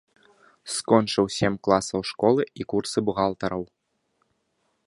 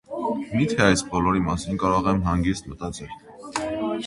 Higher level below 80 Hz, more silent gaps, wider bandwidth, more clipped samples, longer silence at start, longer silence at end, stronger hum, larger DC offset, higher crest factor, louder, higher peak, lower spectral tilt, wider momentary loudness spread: second, -56 dBFS vs -40 dBFS; neither; about the same, 11.5 kHz vs 11.5 kHz; neither; first, 0.65 s vs 0.1 s; first, 1.2 s vs 0 s; neither; neither; about the same, 24 dB vs 22 dB; about the same, -24 LUFS vs -24 LUFS; about the same, -2 dBFS vs -2 dBFS; about the same, -5 dB/octave vs -5.5 dB/octave; second, 10 LU vs 14 LU